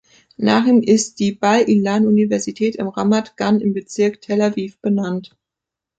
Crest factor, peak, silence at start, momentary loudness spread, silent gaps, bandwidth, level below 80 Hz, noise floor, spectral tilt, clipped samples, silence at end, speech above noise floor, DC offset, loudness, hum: 16 dB; -2 dBFS; 0.4 s; 7 LU; none; 9 kHz; -60 dBFS; -85 dBFS; -5.5 dB/octave; under 0.1%; 0.7 s; 68 dB; under 0.1%; -17 LUFS; none